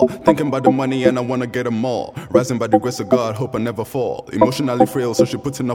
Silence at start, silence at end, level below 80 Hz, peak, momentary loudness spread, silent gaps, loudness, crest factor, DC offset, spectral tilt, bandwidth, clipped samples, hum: 0 s; 0 s; -52 dBFS; 0 dBFS; 6 LU; none; -18 LUFS; 18 dB; under 0.1%; -6 dB/octave; 17.5 kHz; under 0.1%; none